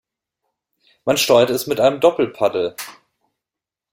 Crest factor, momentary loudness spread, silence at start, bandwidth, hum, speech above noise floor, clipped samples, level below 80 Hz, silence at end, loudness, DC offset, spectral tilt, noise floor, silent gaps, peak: 18 dB; 13 LU; 1.05 s; 16.5 kHz; none; 70 dB; under 0.1%; -62 dBFS; 1 s; -17 LUFS; under 0.1%; -3.5 dB/octave; -87 dBFS; none; -2 dBFS